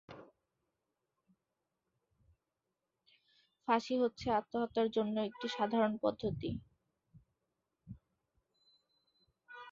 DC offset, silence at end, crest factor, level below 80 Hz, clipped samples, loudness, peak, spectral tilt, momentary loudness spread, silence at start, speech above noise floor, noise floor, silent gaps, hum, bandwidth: under 0.1%; 0 s; 22 dB; -68 dBFS; under 0.1%; -36 LUFS; -18 dBFS; -4.5 dB/octave; 23 LU; 0.1 s; 53 dB; -88 dBFS; none; none; 7.4 kHz